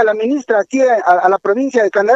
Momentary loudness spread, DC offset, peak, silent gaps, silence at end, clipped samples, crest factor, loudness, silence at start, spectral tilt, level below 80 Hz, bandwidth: 4 LU; under 0.1%; 0 dBFS; none; 0 s; under 0.1%; 12 dB; -13 LUFS; 0 s; -4.5 dB/octave; -66 dBFS; 8 kHz